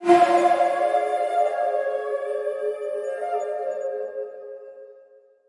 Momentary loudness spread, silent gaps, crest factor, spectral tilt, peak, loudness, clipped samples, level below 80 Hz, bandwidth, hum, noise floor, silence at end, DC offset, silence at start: 17 LU; none; 20 dB; -4.5 dB/octave; -4 dBFS; -23 LUFS; under 0.1%; -84 dBFS; 11.5 kHz; none; -53 dBFS; 0.55 s; under 0.1%; 0 s